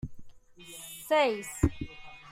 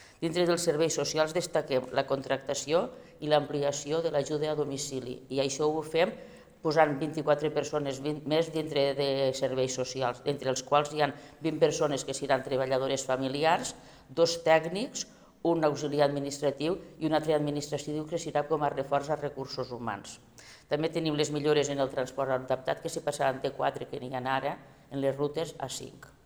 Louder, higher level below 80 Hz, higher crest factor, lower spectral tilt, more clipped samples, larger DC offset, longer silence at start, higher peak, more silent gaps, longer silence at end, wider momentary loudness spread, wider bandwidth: about the same, -29 LUFS vs -30 LUFS; first, -46 dBFS vs -64 dBFS; about the same, 24 dB vs 22 dB; about the same, -5 dB/octave vs -4.5 dB/octave; neither; neither; about the same, 0.05 s vs 0 s; about the same, -8 dBFS vs -8 dBFS; neither; second, 0 s vs 0.15 s; first, 20 LU vs 9 LU; second, 16 kHz vs over 20 kHz